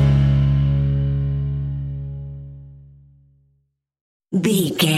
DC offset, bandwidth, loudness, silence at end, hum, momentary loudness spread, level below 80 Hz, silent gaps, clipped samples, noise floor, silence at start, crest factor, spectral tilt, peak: under 0.1%; 15 kHz; -20 LUFS; 0 s; none; 18 LU; -30 dBFS; 4.01-4.20 s; under 0.1%; -67 dBFS; 0 s; 16 dB; -6 dB/octave; -4 dBFS